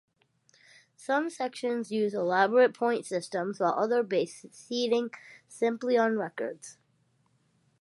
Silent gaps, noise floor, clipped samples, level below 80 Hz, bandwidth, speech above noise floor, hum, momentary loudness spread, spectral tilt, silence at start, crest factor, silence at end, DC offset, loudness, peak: none; -70 dBFS; under 0.1%; -86 dBFS; 11.5 kHz; 42 dB; none; 15 LU; -4.5 dB/octave; 1 s; 20 dB; 1.1 s; under 0.1%; -29 LUFS; -10 dBFS